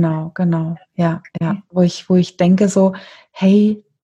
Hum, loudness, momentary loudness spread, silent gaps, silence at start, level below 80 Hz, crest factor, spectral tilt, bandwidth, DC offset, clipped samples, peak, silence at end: none; -16 LUFS; 9 LU; none; 0 s; -56 dBFS; 14 dB; -7.5 dB/octave; 8.8 kHz; under 0.1%; under 0.1%; -2 dBFS; 0.25 s